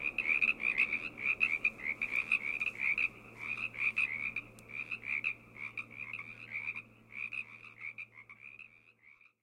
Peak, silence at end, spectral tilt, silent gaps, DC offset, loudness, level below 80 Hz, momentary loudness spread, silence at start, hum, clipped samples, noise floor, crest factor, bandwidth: -16 dBFS; 0.3 s; -3 dB/octave; none; under 0.1%; -34 LUFS; -70 dBFS; 17 LU; 0 s; none; under 0.1%; -64 dBFS; 22 dB; 16 kHz